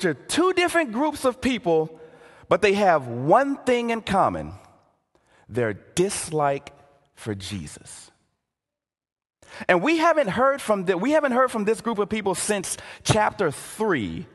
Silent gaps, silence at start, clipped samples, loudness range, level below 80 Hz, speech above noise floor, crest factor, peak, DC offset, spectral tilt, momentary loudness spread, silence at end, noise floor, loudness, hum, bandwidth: 9.12-9.16 s; 0 s; under 0.1%; 7 LU; -52 dBFS; 66 dB; 20 dB; -2 dBFS; under 0.1%; -4.5 dB/octave; 13 LU; 0.1 s; -89 dBFS; -23 LUFS; none; 12.5 kHz